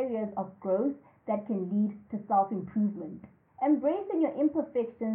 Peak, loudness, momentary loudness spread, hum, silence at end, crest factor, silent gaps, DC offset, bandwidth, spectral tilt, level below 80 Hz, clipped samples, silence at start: -14 dBFS; -30 LUFS; 10 LU; none; 0 s; 16 dB; none; under 0.1%; 3.4 kHz; -12.5 dB/octave; -74 dBFS; under 0.1%; 0 s